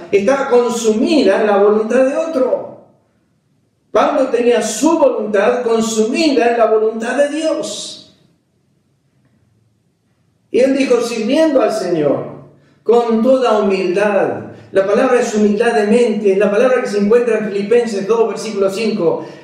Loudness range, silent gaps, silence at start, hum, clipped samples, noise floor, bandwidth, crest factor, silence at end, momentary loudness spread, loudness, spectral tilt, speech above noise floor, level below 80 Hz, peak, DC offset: 6 LU; none; 0 s; none; under 0.1%; -60 dBFS; 14 kHz; 14 dB; 0.05 s; 6 LU; -14 LUFS; -5 dB/octave; 47 dB; -58 dBFS; -2 dBFS; under 0.1%